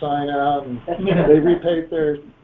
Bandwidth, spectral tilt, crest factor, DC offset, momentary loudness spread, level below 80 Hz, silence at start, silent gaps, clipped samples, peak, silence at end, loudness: 4 kHz; -10.5 dB/octave; 18 dB; under 0.1%; 10 LU; -44 dBFS; 0 s; none; under 0.1%; 0 dBFS; 0.2 s; -19 LUFS